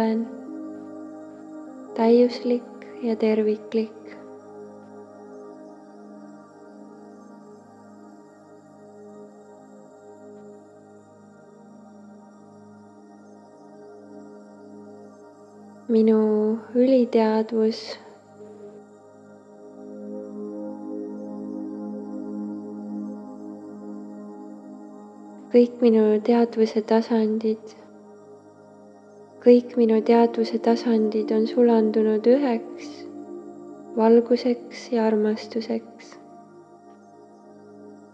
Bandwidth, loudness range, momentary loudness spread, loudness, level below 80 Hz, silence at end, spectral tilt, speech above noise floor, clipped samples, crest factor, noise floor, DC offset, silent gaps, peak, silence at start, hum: 8 kHz; 16 LU; 26 LU; -22 LUFS; -86 dBFS; 0.2 s; -7 dB/octave; 29 dB; under 0.1%; 22 dB; -49 dBFS; under 0.1%; none; -4 dBFS; 0 s; none